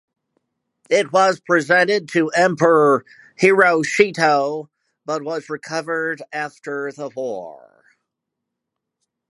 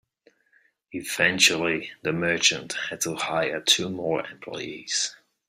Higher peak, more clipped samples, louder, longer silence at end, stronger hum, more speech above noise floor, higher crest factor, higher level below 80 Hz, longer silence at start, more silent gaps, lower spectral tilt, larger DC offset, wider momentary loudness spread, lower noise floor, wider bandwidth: first, 0 dBFS vs -4 dBFS; neither; first, -18 LUFS vs -24 LUFS; first, 1.75 s vs 0.35 s; neither; first, 63 dB vs 39 dB; about the same, 20 dB vs 22 dB; about the same, -70 dBFS vs -66 dBFS; about the same, 0.9 s vs 0.9 s; neither; first, -4.5 dB/octave vs -2 dB/octave; neither; second, 13 LU vs 16 LU; first, -81 dBFS vs -65 dBFS; second, 11.5 kHz vs 16 kHz